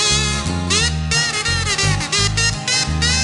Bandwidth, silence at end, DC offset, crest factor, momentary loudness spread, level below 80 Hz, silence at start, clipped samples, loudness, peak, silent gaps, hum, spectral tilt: 11.5 kHz; 0 s; under 0.1%; 16 dB; 2 LU; -28 dBFS; 0 s; under 0.1%; -16 LUFS; -2 dBFS; none; none; -2.5 dB/octave